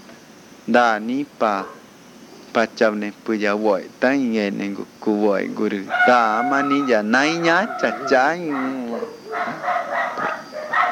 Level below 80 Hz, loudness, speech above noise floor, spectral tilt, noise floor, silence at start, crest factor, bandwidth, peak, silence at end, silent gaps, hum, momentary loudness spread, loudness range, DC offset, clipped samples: -72 dBFS; -20 LUFS; 25 dB; -5 dB/octave; -44 dBFS; 0.1 s; 20 dB; 17 kHz; 0 dBFS; 0 s; none; none; 10 LU; 4 LU; under 0.1%; under 0.1%